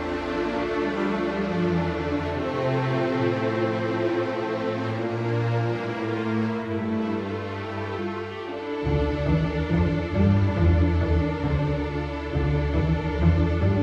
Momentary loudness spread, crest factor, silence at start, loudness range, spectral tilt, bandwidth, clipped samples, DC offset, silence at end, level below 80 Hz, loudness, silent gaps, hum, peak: 8 LU; 16 dB; 0 s; 4 LU; -8.5 dB/octave; 7.6 kHz; under 0.1%; under 0.1%; 0 s; -34 dBFS; -25 LUFS; none; none; -8 dBFS